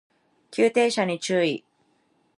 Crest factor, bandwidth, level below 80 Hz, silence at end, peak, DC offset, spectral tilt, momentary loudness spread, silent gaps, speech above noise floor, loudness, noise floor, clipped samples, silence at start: 18 dB; 11.5 kHz; -78 dBFS; 0.8 s; -8 dBFS; under 0.1%; -4.5 dB/octave; 12 LU; none; 44 dB; -24 LUFS; -67 dBFS; under 0.1%; 0.5 s